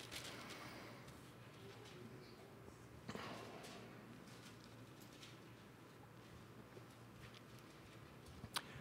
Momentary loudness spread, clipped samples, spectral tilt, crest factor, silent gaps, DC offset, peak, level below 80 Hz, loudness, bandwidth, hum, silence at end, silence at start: 9 LU; under 0.1%; -4 dB/octave; 32 dB; none; under 0.1%; -24 dBFS; -74 dBFS; -56 LUFS; 16 kHz; none; 0 s; 0 s